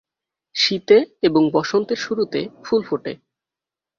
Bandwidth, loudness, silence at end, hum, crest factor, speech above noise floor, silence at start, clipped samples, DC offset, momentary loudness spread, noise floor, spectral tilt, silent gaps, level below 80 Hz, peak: 7.2 kHz; -19 LUFS; 0.85 s; none; 18 dB; 69 dB; 0.55 s; under 0.1%; under 0.1%; 12 LU; -88 dBFS; -4.5 dB/octave; none; -62 dBFS; -2 dBFS